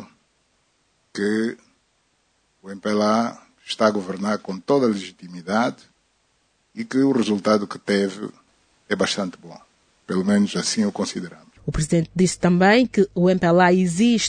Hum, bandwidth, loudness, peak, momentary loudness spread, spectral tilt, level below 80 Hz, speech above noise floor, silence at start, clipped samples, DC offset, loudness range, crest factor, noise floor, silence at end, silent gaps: none; 9.6 kHz; -21 LUFS; -2 dBFS; 18 LU; -5 dB/octave; -48 dBFS; 46 dB; 0 s; under 0.1%; under 0.1%; 5 LU; 20 dB; -66 dBFS; 0 s; none